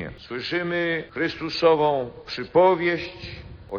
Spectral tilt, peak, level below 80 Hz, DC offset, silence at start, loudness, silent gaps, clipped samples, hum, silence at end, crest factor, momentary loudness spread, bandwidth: -3.5 dB/octave; -6 dBFS; -52 dBFS; under 0.1%; 0 s; -23 LUFS; none; under 0.1%; none; 0 s; 18 dB; 15 LU; 7 kHz